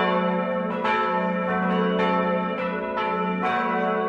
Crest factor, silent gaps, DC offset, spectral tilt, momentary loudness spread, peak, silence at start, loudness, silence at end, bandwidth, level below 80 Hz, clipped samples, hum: 14 dB; none; under 0.1%; -8 dB/octave; 4 LU; -10 dBFS; 0 s; -24 LUFS; 0 s; 7 kHz; -60 dBFS; under 0.1%; none